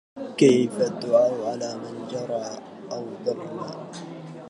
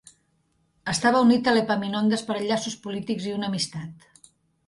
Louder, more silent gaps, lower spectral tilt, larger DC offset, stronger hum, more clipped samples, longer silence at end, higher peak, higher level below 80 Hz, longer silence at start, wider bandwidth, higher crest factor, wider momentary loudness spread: about the same, -25 LUFS vs -24 LUFS; neither; about the same, -5.5 dB/octave vs -4.5 dB/octave; neither; neither; neither; second, 0 s vs 0.75 s; first, -4 dBFS vs -8 dBFS; second, -74 dBFS vs -64 dBFS; second, 0.15 s vs 0.85 s; about the same, 11.5 kHz vs 11.5 kHz; about the same, 20 dB vs 16 dB; first, 18 LU vs 13 LU